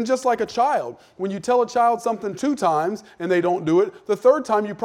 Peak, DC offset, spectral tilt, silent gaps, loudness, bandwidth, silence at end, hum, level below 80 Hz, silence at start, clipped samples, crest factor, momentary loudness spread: -4 dBFS; under 0.1%; -5.5 dB/octave; none; -21 LUFS; 14 kHz; 0 s; none; -66 dBFS; 0 s; under 0.1%; 16 dB; 9 LU